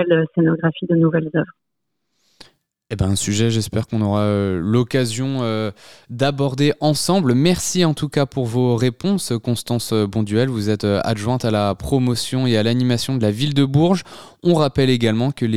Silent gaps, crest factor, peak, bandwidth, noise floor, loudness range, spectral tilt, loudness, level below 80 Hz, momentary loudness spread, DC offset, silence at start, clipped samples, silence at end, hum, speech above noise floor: none; 16 dB; -2 dBFS; 15.5 kHz; -78 dBFS; 3 LU; -6 dB/octave; -19 LUFS; -46 dBFS; 5 LU; 0.6%; 0 s; under 0.1%; 0 s; none; 60 dB